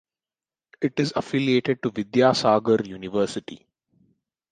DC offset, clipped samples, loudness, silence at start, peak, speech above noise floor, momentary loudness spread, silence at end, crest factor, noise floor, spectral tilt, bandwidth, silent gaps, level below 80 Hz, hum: under 0.1%; under 0.1%; -23 LUFS; 0.8 s; -4 dBFS; over 68 dB; 10 LU; 0.95 s; 20 dB; under -90 dBFS; -5.5 dB/octave; 9.6 kHz; none; -62 dBFS; none